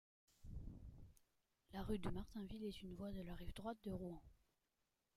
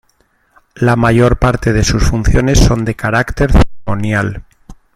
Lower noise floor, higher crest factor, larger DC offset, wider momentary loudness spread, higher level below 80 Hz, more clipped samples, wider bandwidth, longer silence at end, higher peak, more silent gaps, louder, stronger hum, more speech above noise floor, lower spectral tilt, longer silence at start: first, -89 dBFS vs -57 dBFS; first, 20 dB vs 12 dB; neither; first, 15 LU vs 6 LU; second, -60 dBFS vs -18 dBFS; neither; about the same, 16 kHz vs 15 kHz; first, 0.8 s vs 0.25 s; second, -30 dBFS vs 0 dBFS; neither; second, -52 LUFS vs -13 LUFS; neither; second, 40 dB vs 46 dB; about the same, -7 dB/octave vs -6 dB/octave; second, 0.4 s vs 0.75 s